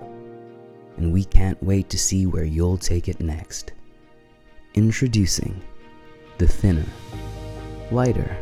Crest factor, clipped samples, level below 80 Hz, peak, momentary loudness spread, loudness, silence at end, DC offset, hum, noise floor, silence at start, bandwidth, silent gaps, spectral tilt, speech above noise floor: 22 dB; under 0.1%; -28 dBFS; 0 dBFS; 20 LU; -23 LUFS; 0 s; under 0.1%; none; -51 dBFS; 0 s; 14.5 kHz; none; -5.5 dB/octave; 31 dB